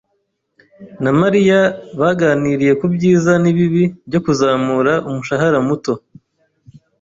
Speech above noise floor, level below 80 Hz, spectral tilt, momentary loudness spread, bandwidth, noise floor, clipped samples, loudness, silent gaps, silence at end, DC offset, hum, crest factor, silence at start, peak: 54 dB; -52 dBFS; -7 dB/octave; 7 LU; 7.8 kHz; -68 dBFS; under 0.1%; -15 LUFS; none; 1.05 s; under 0.1%; none; 14 dB; 0.8 s; -2 dBFS